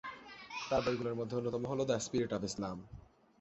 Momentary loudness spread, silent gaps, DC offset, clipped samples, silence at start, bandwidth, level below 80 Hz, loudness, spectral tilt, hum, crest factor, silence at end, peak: 15 LU; none; under 0.1%; under 0.1%; 0.05 s; 8 kHz; -62 dBFS; -37 LUFS; -5 dB/octave; none; 18 dB; 0.4 s; -20 dBFS